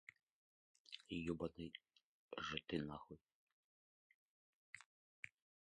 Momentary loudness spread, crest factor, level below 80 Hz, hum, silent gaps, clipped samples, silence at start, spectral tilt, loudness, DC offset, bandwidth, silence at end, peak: 16 LU; 26 dB; -72 dBFS; none; 2.03-2.29 s, 3.21-3.25 s, 3.34-3.47 s, 3.53-4.73 s, 4.86-5.23 s; under 0.1%; 0.9 s; -5.5 dB/octave; -50 LUFS; under 0.1%; 10 kHz; 0.4 s; -28 dBFS